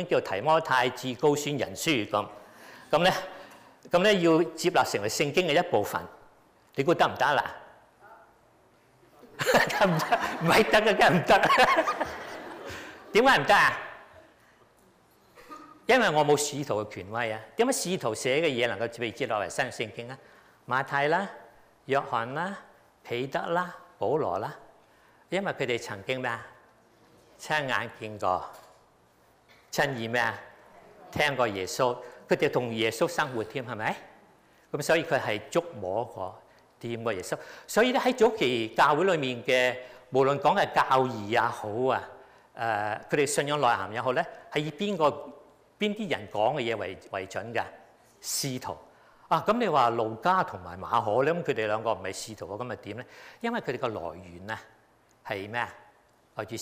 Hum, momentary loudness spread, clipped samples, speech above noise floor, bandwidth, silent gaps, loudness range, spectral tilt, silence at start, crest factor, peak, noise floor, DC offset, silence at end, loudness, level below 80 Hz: none; 16 LU; under 0.1%; 35 dB; 15.5 kHz; none; 9 LU; -4 dB/octave; 0 s; 16 dB; -12 dBFS; -62 dBFS; under 0.1%; 0 s; -27 LUFS; -62 dBFS